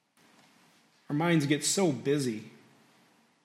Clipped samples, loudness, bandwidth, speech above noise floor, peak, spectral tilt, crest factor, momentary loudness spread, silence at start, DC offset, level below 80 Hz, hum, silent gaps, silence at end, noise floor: under 0.1%; -28 LUFS; 16 kHz; 37 dB; -14 dBFS; -4.5 dB/octave; 18 dB; 9 LU; 1.1 s; under 0.1%; -78 dBFS; none; none; 0.95 s; -65 dBFS